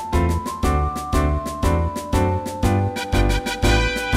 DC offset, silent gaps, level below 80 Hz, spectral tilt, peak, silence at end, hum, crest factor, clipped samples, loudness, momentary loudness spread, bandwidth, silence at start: under 0.1%; none; -24 dBFS; -5.5 dB/octave; -4 dBFS; 0 s; none; 16 dB; under 0.1%; -21 LUFS; 4 LU; 16 kHz; 0 s